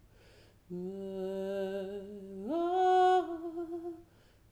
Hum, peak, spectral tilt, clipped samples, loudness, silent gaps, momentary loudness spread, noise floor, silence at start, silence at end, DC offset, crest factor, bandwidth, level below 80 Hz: none; -18 dBFS; -6.5 dB/octave; under 0.1%; -33 LUFS; none; 19 LU; -62 dBFS; 0.7 s; 0.5 s; under 0.1%; 16 dB; 13 kHz; -68 dBFS